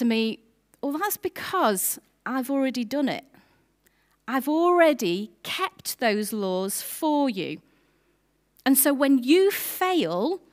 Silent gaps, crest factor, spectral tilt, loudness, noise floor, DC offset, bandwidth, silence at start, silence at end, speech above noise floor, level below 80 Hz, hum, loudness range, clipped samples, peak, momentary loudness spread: none; 20 dB; -3.5 dB/octave; -24 LUFS; -68 dBFS; under 0.1%; 16 kHz; 0 s; 0.15 s; 44 dB; -72 dBFS; none; 4 LU; under 0.1%; -6 dBFS; 12 LU